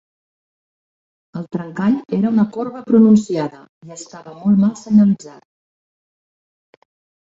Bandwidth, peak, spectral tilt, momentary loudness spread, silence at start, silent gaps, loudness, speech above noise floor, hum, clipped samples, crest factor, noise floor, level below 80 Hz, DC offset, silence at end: 7.8 kHz; -2 dBFS; -8 dB/octave; 21 LU; 1.35 s; 3.69-3.81 s; -16 LUFS; over 74 dB; none; under 0.1%; 16 dB; under -90 dBFS; -60 dBFS; under 0.1%; 1.95 s